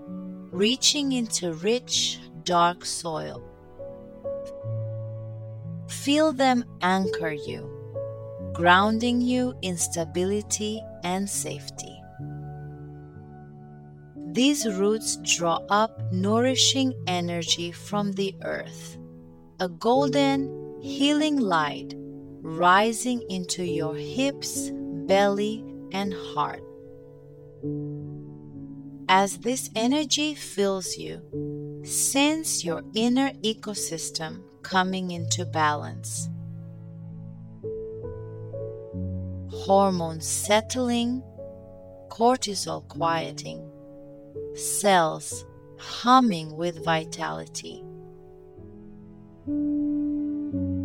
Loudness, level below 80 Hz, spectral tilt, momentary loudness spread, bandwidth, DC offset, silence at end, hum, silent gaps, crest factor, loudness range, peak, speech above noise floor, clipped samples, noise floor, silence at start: -25 LUFS; -58 dBFS; -3.5 dB/octave; 20 LU; 18 kHz; under 0.1%; 0 s; none; none; 22 dB; 8 LU; -4 dBFS; 22 dB; under 0.1%; -47 dBFS; 0 s